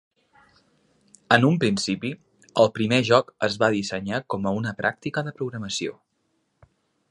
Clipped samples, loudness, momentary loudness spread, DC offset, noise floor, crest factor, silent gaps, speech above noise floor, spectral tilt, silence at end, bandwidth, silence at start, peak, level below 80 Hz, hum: under 0.1%; -23 LUFS; 11 LU; under 0.1%; -72 dBFS; 24 dB; none; 49 dB; -5 dB/octave; 1.2 s; 11.5 kHz; 1.3 s; 0 dBFS; -60 dBFS; none